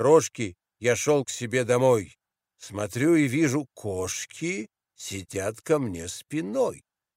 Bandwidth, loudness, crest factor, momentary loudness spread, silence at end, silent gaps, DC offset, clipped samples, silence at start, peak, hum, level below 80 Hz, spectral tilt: 16 kHz; -26 LUFS; 20 dB; 14 LU; 0.4 s; none; under 0.1%; under 0.1%; 0 s; -6 dBFS; none; -62 dBFS; -5 dB/octave